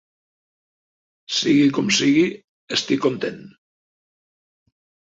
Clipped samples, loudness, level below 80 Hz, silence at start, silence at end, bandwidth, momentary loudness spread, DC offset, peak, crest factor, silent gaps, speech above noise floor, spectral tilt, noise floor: under 0.1%; -19 LUFS; -66 dBFS; 1.3 s; 1.65 s; 7.8 kHz; 8 LU; under 0.1%; -6 dBFS; 18 dB; 2.44-2.68 s; over 71 dB; -4 dB/octave; under -90 dBFS